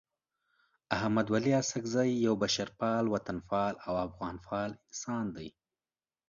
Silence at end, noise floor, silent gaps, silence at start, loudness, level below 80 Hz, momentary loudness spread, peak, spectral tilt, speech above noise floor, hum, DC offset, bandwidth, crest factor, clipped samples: 0.8 s; under -90 dBFS; none; 0.9 s; -32 LUFS; -62 dBFS; 10 LU; -12 dBFS; -5 dB/octave; over 58 dB; none; under 0.1%; 7.4 kHz; 22 dB; under 0.1%